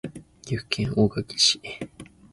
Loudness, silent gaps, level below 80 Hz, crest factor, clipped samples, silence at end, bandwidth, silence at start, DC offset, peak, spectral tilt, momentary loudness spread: -23 LUFS; none; -52 dBFS; 22 dB; under 0.1%; 0.3 s; 11.5 kHz; 0.05 s; under 0.1%; -6 dBFS; -3.5 dB/octave; 20 LU